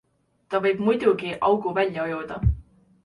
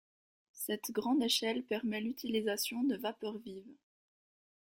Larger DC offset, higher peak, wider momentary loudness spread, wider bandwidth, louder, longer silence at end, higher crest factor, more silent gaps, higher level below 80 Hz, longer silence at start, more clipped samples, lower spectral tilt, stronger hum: neither; first, -6 dBFS vs -16 dBFS; second, 8 LU vs 12 LU; second, 11 kHz vs 16.5 kHz; first, -24 LUFS vs -35 LUFS; second, 0.45 s vs 0.95 s; about the same, 18 dB vs 20 dB; neither; first, -36 dBFS vs -78 dBFS; about the same, 0.5 s vs 0.55 s; neither; first, -8 dB/octave vs -3 dB/octave; neither